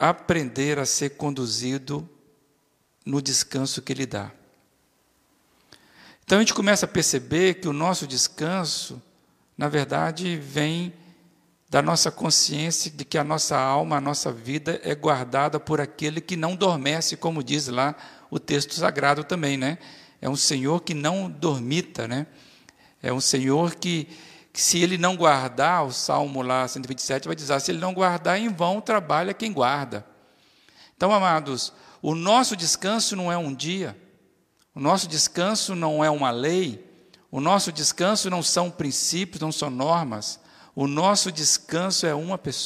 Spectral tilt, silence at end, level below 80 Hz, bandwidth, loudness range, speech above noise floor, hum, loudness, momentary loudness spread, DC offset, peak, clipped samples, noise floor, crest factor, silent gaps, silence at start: -3.5 dB/octave; 0 s; -64 dBFS; 15.5 kHz; 4 LU; 43 dB; none; -23 LUFS; 10 LU; under 0.1%; -4 dBFS; under 0.1%; -67 dBFS; 22 dB; none; 0 s